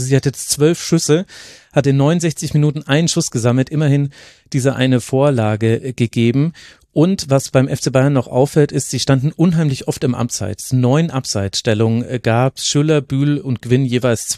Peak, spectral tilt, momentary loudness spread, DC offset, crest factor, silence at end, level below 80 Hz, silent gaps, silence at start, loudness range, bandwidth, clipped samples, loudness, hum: 0 dBFS; -5.5 dB/octave; 5 LU; under 0.1%; 14 dB; 0 s; -50 dBFS; none; 0 s; 1 LU; 14 kHz; under 0.1%; -16 LUFS; none